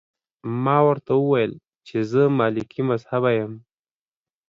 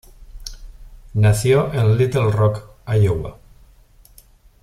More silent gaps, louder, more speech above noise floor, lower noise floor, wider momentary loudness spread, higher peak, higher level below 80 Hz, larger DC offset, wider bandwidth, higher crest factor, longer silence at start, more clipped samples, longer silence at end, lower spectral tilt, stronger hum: neither; second, -21 LUFS vs -18 LUFS; first, over 69 dB vs 33 dB; first, under -90 dBFS vs -49 dBFS; second, 11 LU vs 20 LU; about the same, -4 dBFS vs -4 dBFS; second, -64 dBFS vs -40 dBFS; neither; second, 7.2 kHz vs 14.5 kHz; about the same, 18 dB vs 16 dB; first, 0.45 s vs 0.2 s; neither; second, 0.9 s vs 1.3 s; first, -8.5 dB/octave vs -7 dB/octave; neither